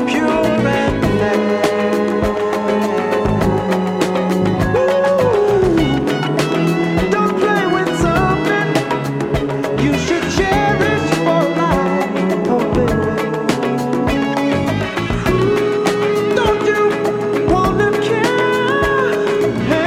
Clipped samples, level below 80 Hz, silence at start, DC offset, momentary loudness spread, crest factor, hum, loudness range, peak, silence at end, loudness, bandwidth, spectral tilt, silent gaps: under 0.1%; -34 dBFS; 0 s; under 0.1%; 3 LU; 14 dB; none; 2 LU; -2 dBFS; 0 s; -16 LUFS; 16 kHz; -6 dB/octave; none